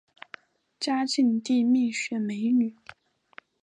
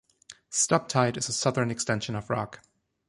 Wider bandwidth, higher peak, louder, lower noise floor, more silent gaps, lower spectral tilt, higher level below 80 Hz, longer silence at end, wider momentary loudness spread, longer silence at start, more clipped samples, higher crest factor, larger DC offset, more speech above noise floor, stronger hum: second, 10 kHz vs 11.5 kHz; second, -14 dBFS vs -8 dBFS; about the same, -26 LUFS vs -27 LUFS; about the same, -53 dBFS vs -53 dBFS; neither; about the same, -4 dB/octave vs -3.5 dB/octave; second, -80 dBFS vs -62 dBFS; first, 0.9 s vs 0.5 s; first, 17 LU vs 8 LU; first, 0.8 s vs 0.3 s; neither; second, 14 dB vs 20 dB; neither; about the same, 29 dB vs 26 dB; neither